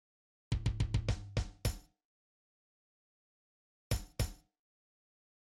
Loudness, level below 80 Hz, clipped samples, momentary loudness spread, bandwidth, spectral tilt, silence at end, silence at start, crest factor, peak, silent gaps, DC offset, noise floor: -39 LUFS; -44 dBFS; under 0.1%; 6 LU; 16.5 kHz; -5 dB/octave; 1.25 s; 0.5 s; 20 dB; -20 dBFS; 2.05-3.90 s; under 0.1%; under -90 dBFS